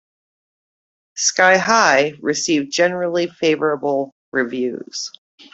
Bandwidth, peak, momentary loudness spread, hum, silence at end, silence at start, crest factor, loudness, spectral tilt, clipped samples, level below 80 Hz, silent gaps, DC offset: 8.2 kHz; 0 dBFS; 13 LU; none; 0.45 s; 1.15 s; 18 dB; -17 LUFS; -2.5 dB/octave; under 0.1%; -66 dBFS; 4.12-4.32 s; under 0.1%